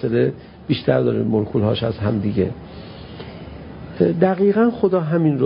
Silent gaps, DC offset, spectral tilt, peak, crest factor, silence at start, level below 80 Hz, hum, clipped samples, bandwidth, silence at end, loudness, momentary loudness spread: none; under 0.1%; -12.5 dB/octave; -2 dBFS; 18 dB; 0 s; -44 dBFS; none; under 0.1%; 5.4 kHz; 0 s; -19 LUFS; 19 LU